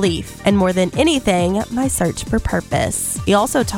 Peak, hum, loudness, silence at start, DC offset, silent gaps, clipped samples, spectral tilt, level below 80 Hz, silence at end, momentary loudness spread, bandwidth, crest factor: -2 dBFS; none; -17 LUFS; 0 s; under 0.1%; none; under 0.1%; -4.5 dB/octave; -34 dBFS; 0 s; 5 LU; 17 kHz; 14 dB